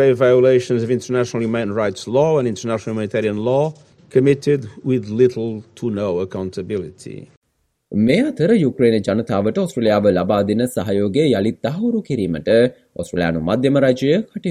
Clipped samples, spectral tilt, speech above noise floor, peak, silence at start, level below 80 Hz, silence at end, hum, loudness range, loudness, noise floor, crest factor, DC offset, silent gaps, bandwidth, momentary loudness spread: under 0.1%; -7 dB/octave; 31 dB; -2 dBFS; 0 s; -54 dBFS; 0 s; none; 4 LU; -18 LUFS; -48 dBFS; 16 dB; under 0.1%; 7.37-7.42 s; 14 kHz; 10 LU